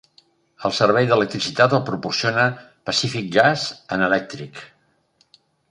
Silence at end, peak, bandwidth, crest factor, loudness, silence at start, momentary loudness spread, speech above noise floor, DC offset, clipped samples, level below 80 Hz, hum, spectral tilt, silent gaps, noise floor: 1.05 s; -2 dBFS; 11 kHz; 20 dB; -19 LUFS; 0.6 s; 14 LU; 43 dB; under 0.1%; under 0.1%; -60 dBFS; none; -4.5 dB/octave; none; -63 dBFS